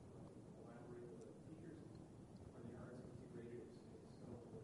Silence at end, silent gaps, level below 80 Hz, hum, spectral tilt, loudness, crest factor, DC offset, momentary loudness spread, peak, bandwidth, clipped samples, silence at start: 0 s; none; -74 dBFS; none; -7.5 dB/octave; -58 LUFS; 14 dB; under 0.1%; 4 LU; -44 dBFS; 11.5 kHz; under 0.1%; 0 s